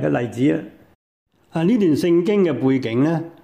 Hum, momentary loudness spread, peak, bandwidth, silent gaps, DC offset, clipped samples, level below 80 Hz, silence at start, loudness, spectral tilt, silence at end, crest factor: none; 5 LU; -8 dBFS; 15 kHz; 0.95-1.26 s; under 0.1%; under 0.1%; -60 dBFS; 0 s; -19 LUFS; -8 dB/octave; 0.15 s; 12 dB